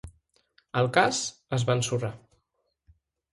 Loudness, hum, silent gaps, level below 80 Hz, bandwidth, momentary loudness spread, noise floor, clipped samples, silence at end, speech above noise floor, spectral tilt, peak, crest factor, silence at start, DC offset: -27 LUFS; none; none; -58 dBFS; 11.5 kHz; 10 LU; -77 dBFS; under 0.1%; 1.15 s; 51 dB; -4 dB/octave; -6 dBFS; 24 dB; 0.05 s; under 0.1%